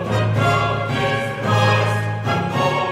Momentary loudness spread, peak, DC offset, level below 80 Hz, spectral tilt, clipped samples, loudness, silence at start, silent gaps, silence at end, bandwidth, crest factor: 5 LU; -4 dBFS; under 0.1%; -46 dBFS; -6 dB/octave; under 0.1%; -19 LUFS; 0 s; none; 0 s; 13 kHz; 14 dB